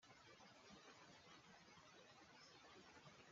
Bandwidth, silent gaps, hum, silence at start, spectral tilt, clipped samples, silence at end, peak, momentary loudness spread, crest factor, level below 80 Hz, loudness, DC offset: 7.4 kHz; none; none; 0 s; -2 dB/octave; under 0.1%; 0 s; -52 dBFS; 2 LU; 14 dB; under -90 dBFS; -65 LUFS; under 0.1%